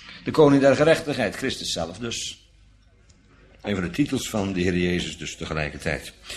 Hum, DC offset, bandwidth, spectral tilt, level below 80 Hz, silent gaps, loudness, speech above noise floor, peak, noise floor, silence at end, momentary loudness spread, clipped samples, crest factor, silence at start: none; under 0.1%; 14 kHz; -5 dB/octave; -46 dBFS; none; -23 LUFS; 32 dB; -4 dBFS; -55 dBFS; 0 s; 13 LU; under 0.1%; 20 dB; 0 s